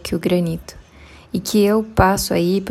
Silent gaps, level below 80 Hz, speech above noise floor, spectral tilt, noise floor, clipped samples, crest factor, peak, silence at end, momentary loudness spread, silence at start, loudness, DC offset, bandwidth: none; -36 dBFS; 26 dB; -5.5 dB/octave; -44 dBFS; under 0.1%; 18 dB; 0 dBFS; 0 s; 10 LU; 0.05 s; -18 LUFS; under 0.1%; 16 kHz